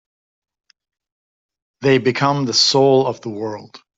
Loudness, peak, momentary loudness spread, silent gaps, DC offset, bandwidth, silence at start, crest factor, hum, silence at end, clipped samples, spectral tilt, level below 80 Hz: -16 LUFS; -2 dBFS; 15 LU; none; under 0.1%; 8 kHz; 1.8 s; 18 dB; none; 0.2 s; under 0.1%; -4 dB/octave; -60 dBFS